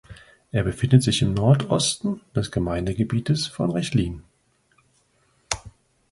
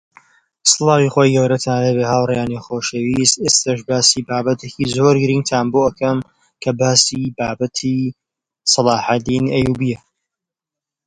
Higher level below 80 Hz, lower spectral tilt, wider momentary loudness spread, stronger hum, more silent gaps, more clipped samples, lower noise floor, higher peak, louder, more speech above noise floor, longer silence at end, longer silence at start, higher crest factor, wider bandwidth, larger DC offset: about the same, -44 dBFS vs -48 dBFS; first, -5.5 dB/octave vs -4 dB/octave; first, 12 LU vs 9 LU; neither; neither; neither; second, -64 dBFS vs -87 dBFS; about the same, -2 dBFS vs 0 dBFS; second, -23 LUFS vs -16 LUFS; second, 43 dB vs 71 dB; second, 0.4 s vs 1.1 s; second, 0.1 s vs 0.65 s; about the same, 22 dB vs 18 dB; about the same, 11.5 kHz vs 10.5 kHz; neither